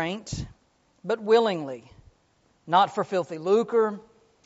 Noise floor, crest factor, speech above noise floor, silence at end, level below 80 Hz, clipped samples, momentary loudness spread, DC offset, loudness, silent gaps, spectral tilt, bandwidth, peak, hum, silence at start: -66 dBFS; 20 dB; 41 dB; 0.45 s; -54 dBFS; under 0.1%; 18 LU; under 0.1%; -25 LUFS; none; -4 dB/octave; 8 kHz; -6 dBFS; none; 0 s